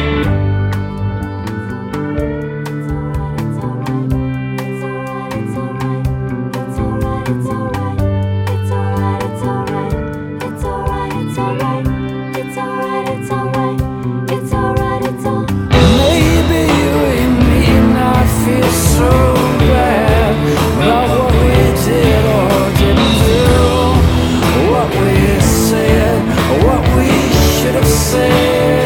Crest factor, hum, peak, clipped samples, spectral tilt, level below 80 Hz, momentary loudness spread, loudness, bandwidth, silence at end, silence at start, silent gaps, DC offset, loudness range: 12 dB; none; 0 dBFS; under 0.1%; -6 dB/octave; -22 dBFS; 10 LU; -14 LUFS; 18.5 kHz; 0 s; 0 s; none; under 0.1%; 8 LU